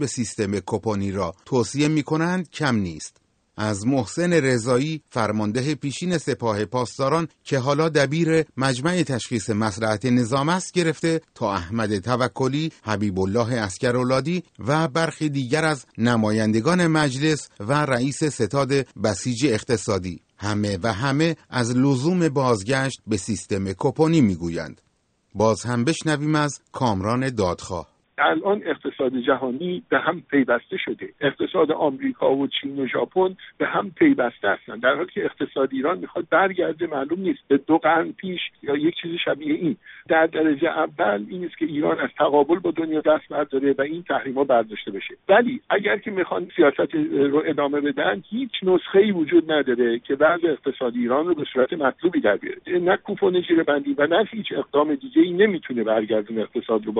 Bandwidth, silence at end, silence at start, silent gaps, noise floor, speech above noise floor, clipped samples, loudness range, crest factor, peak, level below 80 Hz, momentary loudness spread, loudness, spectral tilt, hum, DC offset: 9.4 kHz; 0 s; 0 s; none; -67 dBFS; 45 dB; under 0.1%; 3 LU; 18 dB; -4 dBFS; -58 dBFS; 7 LU; -22 LUFS; -5.5 dB/octave; none; under 0.1%